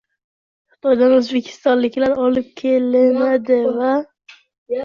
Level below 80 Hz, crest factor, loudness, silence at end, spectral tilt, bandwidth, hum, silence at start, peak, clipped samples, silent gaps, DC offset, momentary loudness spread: -60 dBFS; 14 dB; -17 LUFS; 0 s; -5.5 dB/octave; 7 kHz; none; 0.85 s; -4 dBFS; under 0.1%; 4.58-4.66 s; under 0.1%; 8 LU